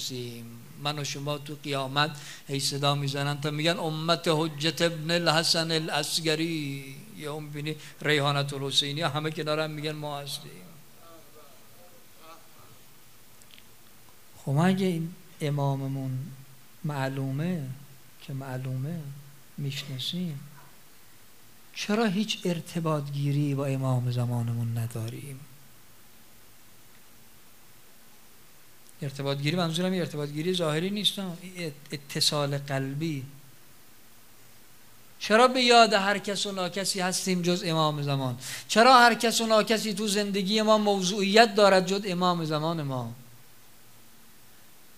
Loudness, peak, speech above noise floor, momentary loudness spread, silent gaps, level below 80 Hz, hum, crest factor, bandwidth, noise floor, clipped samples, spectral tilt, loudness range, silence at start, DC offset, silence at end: -27 LUFS; -2 dBFS; 29 dB; 17 LU; none; -70 dBFS; none; 26 dB; 16 kHz; -56 dBFS; under 0.1%; -4.5 dB/octave; 13 LU; 0 s; 0.3%; 1.75 s